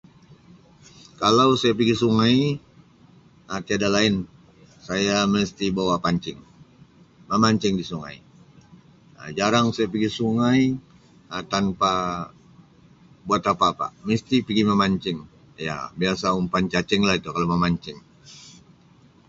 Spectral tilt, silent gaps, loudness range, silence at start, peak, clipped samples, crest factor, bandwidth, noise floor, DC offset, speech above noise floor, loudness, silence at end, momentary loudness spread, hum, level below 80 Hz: -5.5 dB/octave; none; 3 LU; 0.3 s; -4 dBFS; under 0.1%; 20 dB; 7.8 kHz; -54 dBFS; under 0.1%; 32 dB; -22 LUFS; 0.75 s; 14 LU; none; -52 dBFS